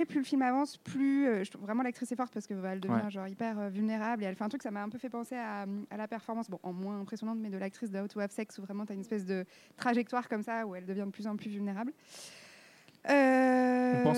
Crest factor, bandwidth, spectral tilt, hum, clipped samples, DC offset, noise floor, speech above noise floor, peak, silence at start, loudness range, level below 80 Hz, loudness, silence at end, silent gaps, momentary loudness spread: 20 dB; 13 kHz; -6.5 dB/octave; none; under 0.1%; under 0.1%; -59 dBFS; 26 dB; -14 dBFS; 0 s; 6 LU; -84 dBFS; -34 LUFS; 0 s; none; 12 LU